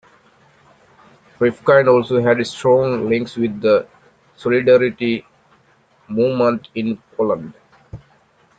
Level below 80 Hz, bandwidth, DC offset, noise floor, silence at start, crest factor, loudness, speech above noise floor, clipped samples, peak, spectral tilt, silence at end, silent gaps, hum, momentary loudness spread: -56 dBFS; 9 kHz; under 0.1%; -55 dBFS; 1.4 s; 18 dB; -17 LUFS; 39 dB; under 0.1%; -2 dBFS; -7 dB/octave; 0.6 s; none; none; 11 LU